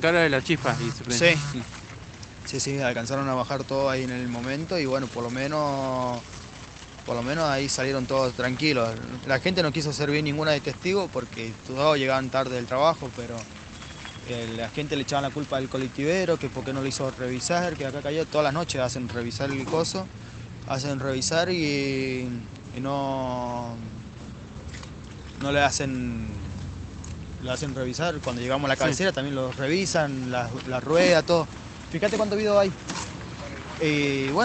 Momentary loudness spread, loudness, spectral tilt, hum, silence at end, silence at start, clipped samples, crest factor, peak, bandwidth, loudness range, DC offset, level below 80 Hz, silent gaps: 16 LU; -26 LUFS; -4.5 dB/octave; none; 0 s; 0 s; under 0.1%; 22 dB; -4 dBFS; 9.2 kHz; 5 LU; under 0.1%; -50 dBFS; none